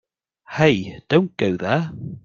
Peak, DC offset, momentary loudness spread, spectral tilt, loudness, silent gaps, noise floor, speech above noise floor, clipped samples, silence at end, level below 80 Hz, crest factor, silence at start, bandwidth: -2 dBFS; under 0.1%; 9 LU; -7 dB/octave; -20 LUFS; none; -46 dBFS; 26 dB; under 0.1%; 0.05 s; -56 dBFS; 20 dB; 0.5 s; 7.4 kHz